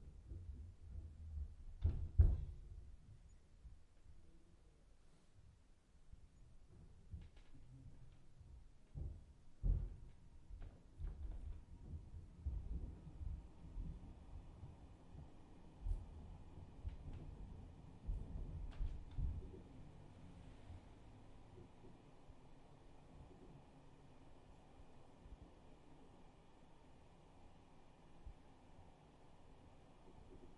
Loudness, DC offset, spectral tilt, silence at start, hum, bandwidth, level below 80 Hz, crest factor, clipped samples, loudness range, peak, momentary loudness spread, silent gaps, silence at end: -50 LUFS; under 0.1%; -8.5 dB/octave; 0 s; none; 9 kHz; -52 dBFS; 30 dB; under 0.1%; 21 LU; -20 dBFS; 19 LU; none; 0 s